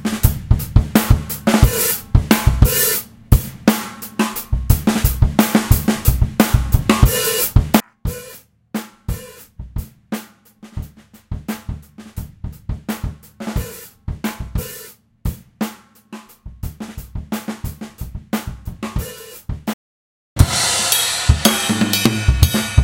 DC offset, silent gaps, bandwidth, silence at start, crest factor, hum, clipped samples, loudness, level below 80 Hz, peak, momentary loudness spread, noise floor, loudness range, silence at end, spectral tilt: under 0.1%; 19.74-20.36 s; 17 kHz; 0 s; 18 dB; none; 0.2%; -18 LUFS; -24 dBFS; 0 dBFS; 18 LU; -44 dBFS; 15 LU; 0 s; -4.5 dB/octave